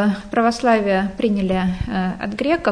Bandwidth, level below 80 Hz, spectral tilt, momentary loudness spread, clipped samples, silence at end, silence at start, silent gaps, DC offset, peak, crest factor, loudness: 10.5 kHz; -38 dBFS; -6.5 dB/octave; 6 LU; under 0.1%; 0 s; 0 s; none; under 0.1%; -4 dBFS; 16 dB; -19 LUFS